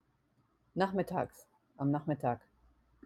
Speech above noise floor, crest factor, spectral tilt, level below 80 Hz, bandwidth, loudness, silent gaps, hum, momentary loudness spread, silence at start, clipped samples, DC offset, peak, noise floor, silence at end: 40 dB; 20 dB; -8 dB/octave; -68 dBFS; 14 kHz; -36 LUFS; none; none; 10 LU; 0.75 s; under 0.1%; under 0.1%; -18 dBFS; -74 dBFS; 0.65 s